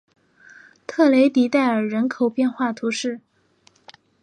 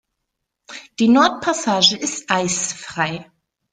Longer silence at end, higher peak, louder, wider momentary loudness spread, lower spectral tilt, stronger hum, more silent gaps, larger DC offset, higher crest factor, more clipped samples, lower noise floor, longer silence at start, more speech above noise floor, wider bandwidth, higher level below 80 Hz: first, 1.05 s vs 0.5 s; second, -4 dBFS vs 0 dBFS; about the same, -20 LUFS vs -18 LUFS; second, 14 LU vs 19 LU; first, -5 dB/octave vs -2.5 dB/octave; neither; neither; neither; about the same, 16 dB vs 20 dB; neither; second, -59 dBFS vs -78 dBFS; first, 0.9 s vs 0.7 s; second, 40 dB vs 60 dB; about the same, 10.5 kHz vs 9.6 kHz; second, -74 dBFS vs -60 dBFS